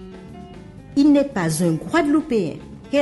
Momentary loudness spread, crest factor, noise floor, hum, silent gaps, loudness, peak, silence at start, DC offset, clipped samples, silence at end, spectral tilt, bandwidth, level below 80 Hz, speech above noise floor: 23 LU; 14 dB; -39 dBFS; none; none; -19 LUFS; -6 dBFS; 0 s; under 0.1%; under 0.1%; 0 s; -6 dB/octave; 11.5 kHz; -48 dBFS; 21 dB